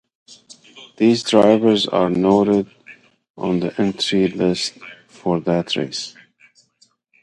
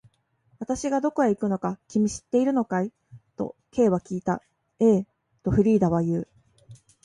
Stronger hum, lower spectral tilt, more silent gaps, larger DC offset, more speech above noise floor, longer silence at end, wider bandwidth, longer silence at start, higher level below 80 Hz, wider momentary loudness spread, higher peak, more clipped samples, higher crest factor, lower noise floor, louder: neither; second, -5.5 dB/octave vs -7.5 dB/octave; first, 3.30-3.34 s vs none; neither; about the same, 42 dB vs 42 dB; first, 1.15 s vs 0.3 s; about the same, 11.5 kHz vs 11 kHz; second, 0.3 s vs 0.6 s; second, -56 dBFS vs -50 dBFS; about the same, 14 LU vs 13 LU; first, 0 dBFS vs -8 dBFS; neither; about the same, 20 dB vs 16 dB; second, -59 dBFS vs -65 dBFS; first, -18 LUFS vs -25 LUFS